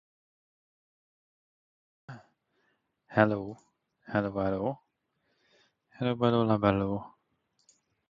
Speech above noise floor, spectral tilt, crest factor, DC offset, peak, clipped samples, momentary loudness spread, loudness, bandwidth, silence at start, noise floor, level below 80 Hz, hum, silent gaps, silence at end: 49 dB; -8.5 dB/octave; 26 dB; under 0.1%; -6 dBFS; under 0.1%; 24 LU; -29 LUFS; 7.4 kHz; 2.1 s; -77 dBFS; -60 dBFS; none; none; 1 s